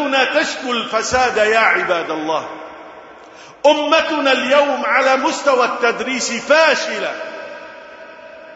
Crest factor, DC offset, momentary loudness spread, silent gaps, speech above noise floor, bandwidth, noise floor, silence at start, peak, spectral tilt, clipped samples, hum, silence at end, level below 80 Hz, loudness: 16 dB; under 0.1%; 21 LU; none; 24 dB; 8 kHz; -40 dBFS; 0 s; 0 dBFS; -2 dB/octave; under 0.1%; none; 0 s; -54 dBFS; -15 LUFS